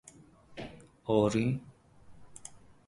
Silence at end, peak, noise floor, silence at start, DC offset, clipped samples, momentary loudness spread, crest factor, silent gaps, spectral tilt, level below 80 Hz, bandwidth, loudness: 0.3 s; -12 dBFS; -57 dBFS; 0.5 s; under 0.1%; under 0.1%; 23 LU; 22 dB; none; -6.5 dB/octave; -60 dBFS; 11.5 kHz; -31 LUFS